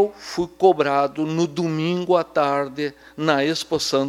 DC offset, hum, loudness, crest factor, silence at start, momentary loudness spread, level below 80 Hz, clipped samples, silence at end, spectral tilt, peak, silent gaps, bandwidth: under 0.1%; none; -21 LUFS; 18 dB; 0 s; 9 LU; -58 dBFS; under 0.1%; 0 s; -5 dB/octave; -2 dBFS; none; 15 kHz